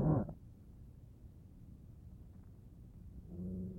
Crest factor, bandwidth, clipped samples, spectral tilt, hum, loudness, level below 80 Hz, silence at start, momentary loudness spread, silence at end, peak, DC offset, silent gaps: 22 dB; 2 kHz; under 0.1%; -11.5 dB/octave; none; -45 LUFS; -56 dBFS; 0 s; 16 LU; 0 s; -22 dBFS; under 0.1%; none